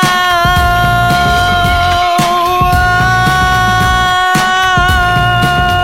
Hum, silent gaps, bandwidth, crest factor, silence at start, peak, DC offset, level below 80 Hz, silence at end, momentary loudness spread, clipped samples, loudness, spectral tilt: none; none; 17 kHz; 10 dB; 0 s; 0 dBFS; 0.9%; -22 dBFS; 0 s; 1 LU; under 0.1%; -10 LUFS; -4 dB/octave